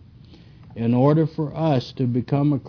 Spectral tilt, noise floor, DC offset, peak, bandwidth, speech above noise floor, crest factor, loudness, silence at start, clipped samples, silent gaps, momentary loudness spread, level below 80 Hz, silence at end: -9.5 dB/octave; -46 dBFS; under 0.1%; -4 dBFS; 5.4 kHz; 26 dB; 18 dB; -21 LUFS; 0.3 s; under 0.1%; none; 7 LU; -54 dBFS; 0 s